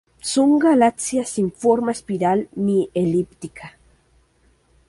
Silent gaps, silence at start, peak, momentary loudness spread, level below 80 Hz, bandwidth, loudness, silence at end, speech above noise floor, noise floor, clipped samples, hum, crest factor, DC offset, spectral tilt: none; 0.25 s; -4 dBFS; 12 LU; -56 dBFS; 11.5 kHz; -19 LUFS; 1.2 s; 40 dB; -59 dBFS; under 0.1%; none; 16 dB; under 0.1%; -5.5 dB/octave